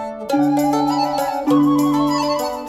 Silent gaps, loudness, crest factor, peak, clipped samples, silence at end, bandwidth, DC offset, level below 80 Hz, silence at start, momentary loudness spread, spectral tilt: none; -17 LUFS; 12 dB; -4 dBFS; under 0.1%; 0 s; 15.5 kHz; under 0.1%; -52 dBFS; 0 s; 5 LU; -5.5 dB/octave